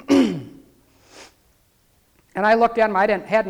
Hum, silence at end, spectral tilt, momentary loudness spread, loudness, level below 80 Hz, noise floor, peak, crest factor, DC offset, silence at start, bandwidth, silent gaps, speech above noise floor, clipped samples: none; 0 s; -5.5 dB/octave; 12 LU; -18 LUFS; -54 dBFS; -61 dBFS; -6 dBFS; 16 dB; under 0.1%; 0.1 s; 13.5 kHz; none; 43 dB; under 0.1%